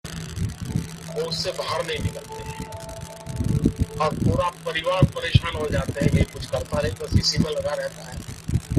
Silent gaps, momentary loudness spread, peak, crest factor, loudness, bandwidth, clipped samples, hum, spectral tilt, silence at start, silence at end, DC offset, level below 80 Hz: none; 13 LU; -2 dBFS; 22 dB; -25 LUFS; 14.5 kHz; under 0.1%; none; -5.5 dB/octave; 0.05 s; 0 s; under 0.1%; -36 dBFS